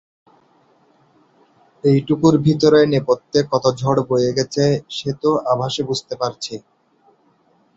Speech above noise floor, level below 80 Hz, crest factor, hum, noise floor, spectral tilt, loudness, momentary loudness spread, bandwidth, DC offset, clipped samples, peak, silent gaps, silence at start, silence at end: 41 dB; -54 dBFS; 18 dB; none; -58 dBFS; -6 dB/octave; -18 LUFS; 10 LU; 8 kHz; under 0.1%; under 0.1%; -2 dBFS; none; 1.85 s; 1.2 s